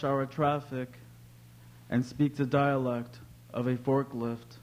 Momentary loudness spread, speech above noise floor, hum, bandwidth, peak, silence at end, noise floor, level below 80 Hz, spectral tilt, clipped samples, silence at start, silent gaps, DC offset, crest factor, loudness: 12 LU; 23 dB; none; 16 kHz; -14 dBFS; 0.05 s; -53 dBFS; -64 dBFS; -8 dB/octave; under 0.1%; 0 s; none; under 0.1%; 18 dB; -31 LUFS